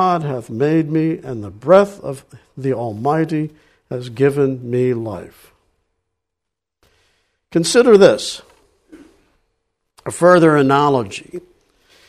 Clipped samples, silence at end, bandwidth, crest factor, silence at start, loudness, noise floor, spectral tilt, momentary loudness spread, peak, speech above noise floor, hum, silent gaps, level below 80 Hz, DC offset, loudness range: under 0.1%; 0.7 s; 13.5 kHz; 18 dB; 0 s; -15 LUFS; -82 dBFS; -6 dB/octave; 19 LU; 0 dBFS; 66 dB; none; none; -56 dBFS; under 0.1%; 7 LU